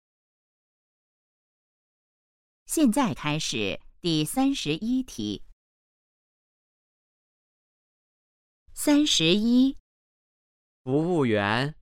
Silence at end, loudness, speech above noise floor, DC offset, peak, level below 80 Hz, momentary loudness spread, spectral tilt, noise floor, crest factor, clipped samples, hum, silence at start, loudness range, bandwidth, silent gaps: 0.1 s; -25 LUFS; over 66 dB; under 0.1%; -8 dBFS; -54 dBFS; 12 LU; -4.5 dB/octave; under -90 dBFS; 20 dB; under 0.1%; none; 2.7 s; 10 LU; 16 kHz; 5.53-8.66 s, 9.80-10.85 s